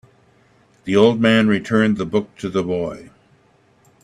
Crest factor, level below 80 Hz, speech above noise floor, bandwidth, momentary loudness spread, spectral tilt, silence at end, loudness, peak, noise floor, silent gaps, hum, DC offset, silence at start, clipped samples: 20 dB; -56 dBFS; 39 dB; 10.5 kHz; 13 LU; -6.5 dB/octave; 1 s; -18 LUFS; 0 dBFS; -56 dBFS; none; none; under 0.1%; 0.85 s; under 0.1%